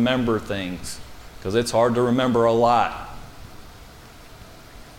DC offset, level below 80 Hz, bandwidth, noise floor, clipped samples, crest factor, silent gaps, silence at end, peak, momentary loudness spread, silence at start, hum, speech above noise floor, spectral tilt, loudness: under 0.1%; -46 dBFS; 17 kHz; -44 dBFS; under 0.1%; 18 dB; none; 0 s; -6 dBFS; 24 LU; 0 s; none; 23 dB; -5.5 dB/octave; -21 LUFS